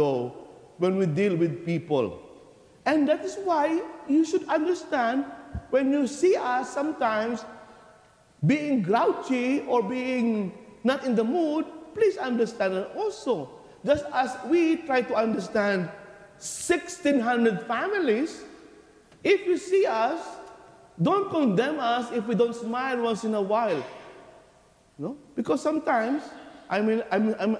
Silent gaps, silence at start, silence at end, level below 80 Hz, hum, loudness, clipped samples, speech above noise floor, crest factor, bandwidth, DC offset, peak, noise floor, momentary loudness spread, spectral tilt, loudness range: none; 0 s; 0 s; -60 dBFS; none; -26 LUFS; under 0.1%; 33 dB; 16 dB; 11 kHz; under 0.1%; -10 dBFS; -59 dBFS; 11 LU; -6 dB/octave; 3 LU